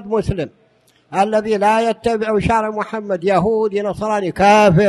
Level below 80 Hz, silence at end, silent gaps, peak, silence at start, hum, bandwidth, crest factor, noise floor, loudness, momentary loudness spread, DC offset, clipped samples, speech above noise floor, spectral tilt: -40 dBFS; 0 s; none; 0 dBFS; 0 s; none; 12.5 kHz; 16 dB; -55 dBFS; -17 LUFS; 11 LU; under 0.1%; under 0.1%; 40 dB; -6 dB/octave